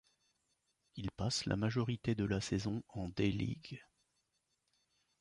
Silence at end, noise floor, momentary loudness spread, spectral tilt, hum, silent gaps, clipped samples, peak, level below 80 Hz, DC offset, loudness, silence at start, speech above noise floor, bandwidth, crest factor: 1.4 s; -83 dBFS; 12 LU; -5.5 dB/octave; none; none; under 0.1%; -20 dBFS; -58 dBFS; under 0.1%; -38 LUFS; 0.95 s; 45 dB; 11 kHz; 20 dB